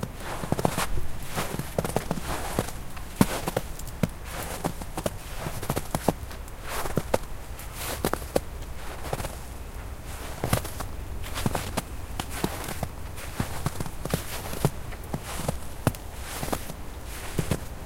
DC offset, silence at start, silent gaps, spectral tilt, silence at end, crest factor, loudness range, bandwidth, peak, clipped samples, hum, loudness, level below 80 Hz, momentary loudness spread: under 0.1%; 0 s; none; -5 dB/octave; 0 s; 28 dB; 3 LU; 17 kHz; -2 dBFS; under 0.1%; none; -32 LUFS; -38 dBFS; 11 LU